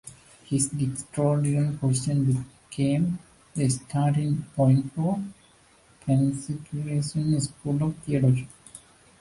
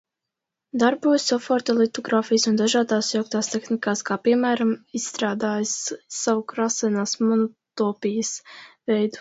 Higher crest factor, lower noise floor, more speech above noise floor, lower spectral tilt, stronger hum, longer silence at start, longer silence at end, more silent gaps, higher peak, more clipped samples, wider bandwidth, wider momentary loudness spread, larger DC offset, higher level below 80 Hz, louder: about the same, 16 dB vs 18 dB; second, -58 dBFS vs -85 dBFS; second, 33 dB vs 62 dB; first, -6.5 dB/octave vs -3.5 dB/octave; neither; second, 0.05 s vs 0.75 s; first, 0.45 s vs 0 s; neither; second, -10 dBFS vs -4 dBFS; neither; first, 11.5 kHz vs 8 kHz; first, 13 LU vs 7 LU; neither; first, -56 dBFS vs -70 dBFS; second, -26 LUFS vs -23 LUFS